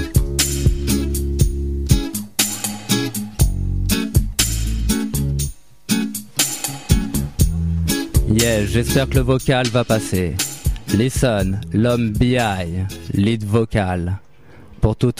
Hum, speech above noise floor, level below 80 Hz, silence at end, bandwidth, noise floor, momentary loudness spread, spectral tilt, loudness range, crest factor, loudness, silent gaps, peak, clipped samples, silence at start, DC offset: none; 27 dB; -26 dBFS; 0.05 s; 16.5 kHz; -44 dBFS; 6 LU; -5 dB/octave; 2 LU; 18 dB; -19 LUFS; none; 0 dBFS; under 0.1%; 0 s; 0.7%